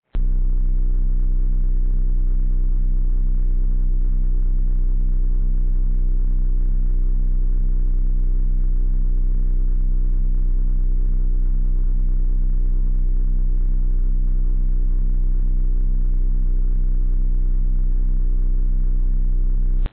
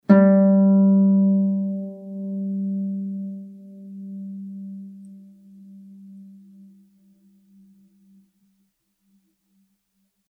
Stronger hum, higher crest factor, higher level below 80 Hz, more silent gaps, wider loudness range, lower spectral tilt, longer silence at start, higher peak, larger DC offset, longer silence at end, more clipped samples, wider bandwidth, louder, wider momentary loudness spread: neither; second, 4 dB vs 20 dB; first, -16 dBFS vs -84 dBFS; neither; second, 0 LU vs 23 LU; about the same, -13 dB/octave vs -12 dB/octave; about the same, 0 s vs 0.1 s; second, -12 dBFS vs -4 dBFS; first, 1% vs under 0.1%; second, 0 s vs 4.1 s; neither; second, 0.6 kHz vs 2.3 kHz; second, -24 LUFS vs -19 LUFS; second, 0 LU vs 25 LU